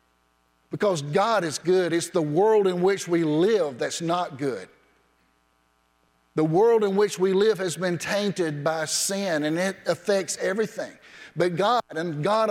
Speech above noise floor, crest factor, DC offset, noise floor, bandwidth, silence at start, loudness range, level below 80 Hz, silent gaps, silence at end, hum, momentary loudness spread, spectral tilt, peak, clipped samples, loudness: 43 dB; 16 dB; under 0.1%; -67 dBFS; 16 kHz; 0.7 s; 4 LU; -70 dBFS; none; 0 s; none; 8 LU; -4.5 dB/octave; -10 dBFS; under 0.1%; -24 LUFS